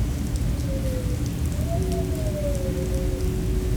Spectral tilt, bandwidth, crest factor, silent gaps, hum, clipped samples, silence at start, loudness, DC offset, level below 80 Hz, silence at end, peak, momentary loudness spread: -6.5 dB/octave; over 20 kHz; 12 dB; none; none; under 0.1%; 0 s; -26 LUFS; under 0.1%; -28 dBFS; 0 s; -12 dBFS; 1 LU